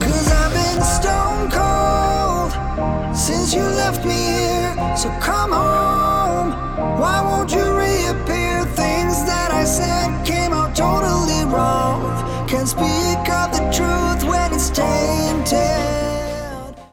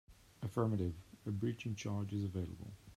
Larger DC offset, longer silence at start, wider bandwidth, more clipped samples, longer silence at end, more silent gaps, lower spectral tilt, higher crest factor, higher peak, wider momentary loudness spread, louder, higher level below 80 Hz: neither; about the same, 0 s vs 0.1 s; first, 18.5 kHz vs 14 kHz; neither; about the same, 0.05 s vs 0 s; neither; second, -4.5 dB/octave vs -7.5 dB/octave; second, 12 dB vs 18 dB; first, -6 dBFS vs -24 dBFS; second, 5 LU vs 11 LU; first, -18 LUFS vs -41 LUFS; first, -26 dBFS vs -64 dBFS